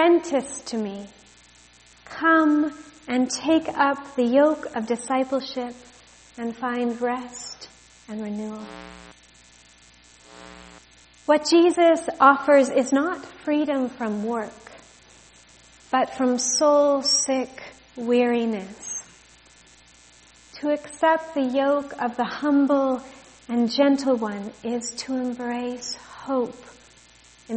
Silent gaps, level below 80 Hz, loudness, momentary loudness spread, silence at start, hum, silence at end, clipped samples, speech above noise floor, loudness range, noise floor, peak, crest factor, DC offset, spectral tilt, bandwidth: none; -62 dBFS; -23 LUFS; 17 LU; 0 s; 60 Hz at -55 dBFS; 0 s; under 0.1%; 31 dB; 11 LU; -53 dBFS; -2 dBFS; 22 dB; under 0.1%; -3 dB/octave; 8.8 kHz